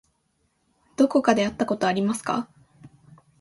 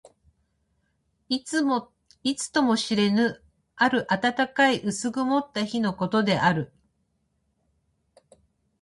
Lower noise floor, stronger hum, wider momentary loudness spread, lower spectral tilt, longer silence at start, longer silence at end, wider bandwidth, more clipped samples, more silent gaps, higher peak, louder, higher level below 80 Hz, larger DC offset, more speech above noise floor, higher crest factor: about the same, -70 dBFS vs -73 dBFS; neither; first, 12 LU vs 8 LU; about the same, -5 dB/octave vs -4.5 dB/octave; second, 1 s vs 1.3 s; second, 0.55 s vs 2.15 s; about the same, 11.5 kHz vs 11.5 kHz; neither; neither; about the same, -4 dBFS vs -6 dBFS; about the same, -23 LUFS vs -24 LUFS; about the same, -62 dBFS vs -64 dBFS; neither; about the same, 48 dB vs 49 dB; about the same, 22 dB vs 20 dB